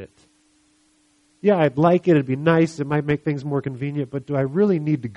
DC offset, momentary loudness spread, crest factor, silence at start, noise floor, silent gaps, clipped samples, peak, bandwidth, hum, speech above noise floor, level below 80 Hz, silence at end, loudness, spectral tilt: under 0.1%; 9 LU; 18 dB; 0 s; -61 dBFS; none; under 0.1%; -4 dBFS; 10.5 kHz; none; 41 dB; -58 dBFS; 0 s; -21 LUFS; -8.5 dB/octave